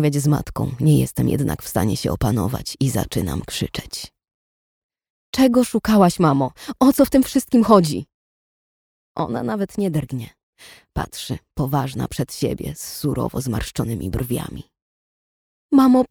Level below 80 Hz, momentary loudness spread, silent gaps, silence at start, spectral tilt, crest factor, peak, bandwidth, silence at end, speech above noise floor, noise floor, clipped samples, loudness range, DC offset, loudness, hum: -40 dBFS; 14 LU; 4.34-4.89 s, 5.10-5.33 s, 8.14-9.15 s, 10.43-10.53 s, 14.82-15.69 s; 0 s; -6.5 dB/octave; 20 dB; 0 dBFS; over 20 kHz; 0.05 s; over 71 dB; under -90 dBFS; under 0.1%; 9 LU; under 0.1%; -20 LUFS; none